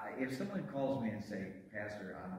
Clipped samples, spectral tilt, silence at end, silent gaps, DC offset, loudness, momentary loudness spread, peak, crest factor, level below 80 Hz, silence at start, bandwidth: under 0.1%; -7 dB/octave; 0 s; none; under 0.1%; -41 LUFS; 8 LU; -26 dBFS; 16 dB; -72 dBFS; 0 s; 16 kHz